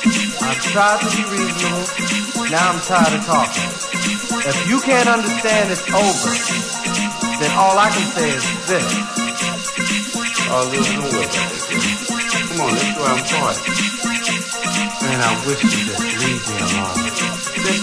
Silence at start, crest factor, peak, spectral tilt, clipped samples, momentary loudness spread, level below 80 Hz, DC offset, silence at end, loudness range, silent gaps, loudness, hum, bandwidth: 0 s; 14 dB; -2 dBFS; -3 dB/octave; under 0.1%; 5 LU; -52 dBFS; under 0.1%; 0 s; 2 LU; none; -17 LUFS; none; 11 kHz